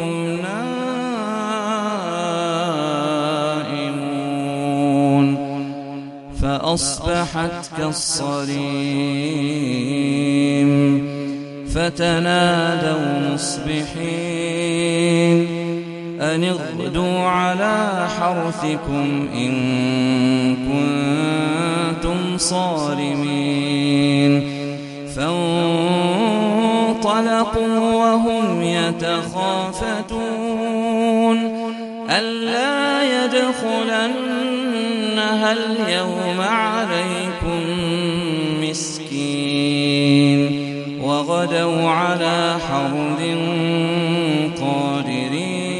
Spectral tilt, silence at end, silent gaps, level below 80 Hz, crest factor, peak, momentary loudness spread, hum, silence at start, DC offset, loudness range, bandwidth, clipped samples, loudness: -5 dB/octave; 0 s; none; -42 dBFS; 18 dB; -2 dBFS; 7 LU; none; 0 s; under 0.1%; 3 LU; 11.5 kHz; under 0.1%; -19 LUFS